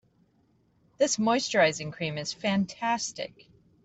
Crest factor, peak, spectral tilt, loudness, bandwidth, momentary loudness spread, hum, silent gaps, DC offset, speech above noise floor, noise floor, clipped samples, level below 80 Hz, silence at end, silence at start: 18 dB; -10 dBFS; -3.5 dB/octave; -27 LUFS; 8.4 kHz; 10 LU; none; none; under 0.1%; 39 dB; -67 dBFS; under 0.1%; -68 dBFS; 0.6 s; 1 s